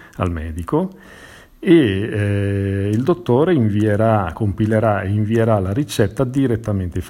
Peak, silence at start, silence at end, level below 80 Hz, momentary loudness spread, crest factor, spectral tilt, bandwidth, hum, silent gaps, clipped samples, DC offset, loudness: 0 dBFS; 0 s; 0 s; -40 dBFS; 8 LU; 16 dB; -7.5 dB/octave; 15 kHz; none; none; under 0.1%; under 0.1%; -18 LUFS